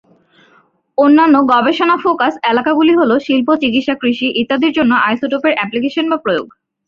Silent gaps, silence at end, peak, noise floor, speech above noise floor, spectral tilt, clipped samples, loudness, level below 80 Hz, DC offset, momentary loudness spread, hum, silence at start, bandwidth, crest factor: none; 0.4 s; -2 dBFS; -53 dBFS; 40 dB; -6 dB/octave; under 0.1%; -13 LUFS; -56 dBFS; under 0.1%; 7 LU; none; 1 s; 7 kHz; 12 dB